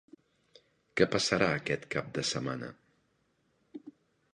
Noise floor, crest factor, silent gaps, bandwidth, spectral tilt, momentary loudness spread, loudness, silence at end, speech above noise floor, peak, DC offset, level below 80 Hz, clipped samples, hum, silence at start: -74 dBFS; 26 dB; none; 10.5 kHz; -4 dB/octave; 23 LU; -31 LUFS; 0.45 s; 43 dB; -10 dBFS; under 0.1%; -64 dBFS; under 0.1%; none; 0.95 s